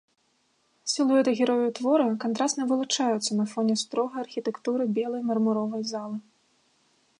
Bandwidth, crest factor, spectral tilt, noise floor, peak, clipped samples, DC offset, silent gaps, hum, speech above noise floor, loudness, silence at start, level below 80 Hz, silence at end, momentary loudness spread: 11.5 kHz; 16 dB; -4 dB/octave; -70 dBFS; -10 dBFS; under 0.1%; under 0.1%; none; none; 44 dB; -26 LUFS; 0.85 s; -82 dBFS; 1 s; 9 LU